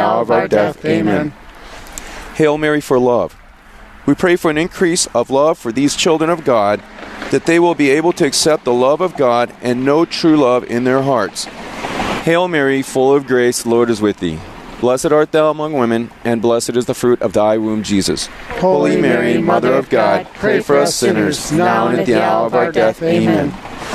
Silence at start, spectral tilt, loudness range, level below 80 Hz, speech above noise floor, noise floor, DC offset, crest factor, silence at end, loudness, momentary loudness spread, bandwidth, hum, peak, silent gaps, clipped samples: 0 s; -4.5 dB/octave; 2 LU; -44 dBFS; 25 dB; -39 dBFS; under 0.1%; 14 dB; 0 s; -14 LUFS; 9 LU; 14.5 kHz; none; -2 dBFS; none; under 0.1%